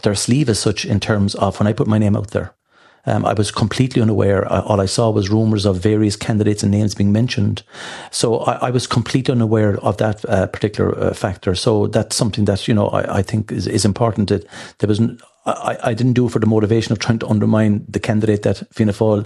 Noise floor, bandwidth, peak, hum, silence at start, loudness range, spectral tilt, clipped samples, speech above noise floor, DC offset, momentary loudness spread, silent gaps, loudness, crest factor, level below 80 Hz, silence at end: -52 dBFS; 12.5 kHz; -2 dBFS; none; 0.05 s; 2 LU; -6 dB/octave; under 0.1%; 36 dB; under 0.1%; 6 LU; none; -17 LUFS; 16 dB; -46 dBFS; 0 s